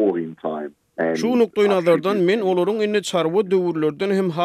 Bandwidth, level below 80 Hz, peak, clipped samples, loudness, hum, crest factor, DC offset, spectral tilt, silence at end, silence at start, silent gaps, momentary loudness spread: 13.5 kHz; -70 dBFS; -6 dBFS; under 0.1%; -20 LUFS; none; 14 dB; under 0.1%; -6 dB/octave; 0 s; 0 s; none; 10 LU